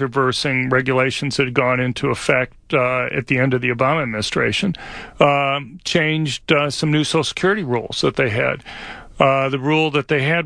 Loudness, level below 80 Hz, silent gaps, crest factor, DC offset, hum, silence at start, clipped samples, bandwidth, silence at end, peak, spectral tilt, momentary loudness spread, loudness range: -18 LUFS; -48 dBFS; none; 18 dB; under 0.1%; none; 0 s; under 0.1%; 10.5 kHz; 0 s; 0 dBFS; -5 dB/octave; 5 LU; 1 LU